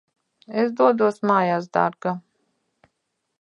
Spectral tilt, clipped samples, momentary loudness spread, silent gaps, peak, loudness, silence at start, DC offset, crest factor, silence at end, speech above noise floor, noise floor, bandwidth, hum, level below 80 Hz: -7.5 dB/octave; under 0.1%; 11 LU; none; -4 dBFS; -21 LUFS; 0.5 s; under 0.1%; 20 dB; 1.2 s; 56 dB; -76 dBFS; 11 kHz; none; -74 dBFS